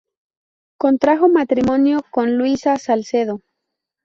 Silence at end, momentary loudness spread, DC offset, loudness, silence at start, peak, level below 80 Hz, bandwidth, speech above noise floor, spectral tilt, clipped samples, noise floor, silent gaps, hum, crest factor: 0.7 s; 7 LU; under 0.1%; -17 LUFS; 0.8 s; -2 dBFS; -54 dBFS; 7.4 kHz; 63 dB; -6 dB/octave; under 0.1%; -79 dBFS; none; none; 16 dB